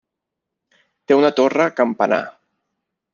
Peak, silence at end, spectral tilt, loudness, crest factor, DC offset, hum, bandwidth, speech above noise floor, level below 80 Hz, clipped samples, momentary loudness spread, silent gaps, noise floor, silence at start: -2 dBFS; 0.85 s; -5.5 dB/octave; -17 LUFS; 18 dB; under 0.1%; none; 7.2 kHz; 65 dB; -68 dBFS; under 0.1%; 6 LU; none; -81 dBFS; 1.1 s